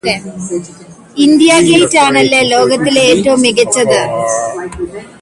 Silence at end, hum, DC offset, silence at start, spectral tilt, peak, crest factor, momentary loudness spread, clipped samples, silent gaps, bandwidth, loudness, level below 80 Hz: 0.15 s; none; under 0.1%; 0.05 s; -3.5 dB/octave; 0 dBFS; 10 dB; 15 LU; under 0.1%; none; 11.5 kHz; -9 LUFS; -44 dBFS